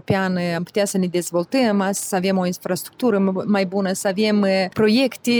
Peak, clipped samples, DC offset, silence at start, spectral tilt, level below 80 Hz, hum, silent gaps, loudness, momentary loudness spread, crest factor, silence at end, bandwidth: -6 dBFS; under 0.1%; under 0.1%; 0.1 s; -5 dB/octave; -60 dBFS; none; none; -20 LUFS; 5 LU; 14 dB; 0 s; over 20 kHz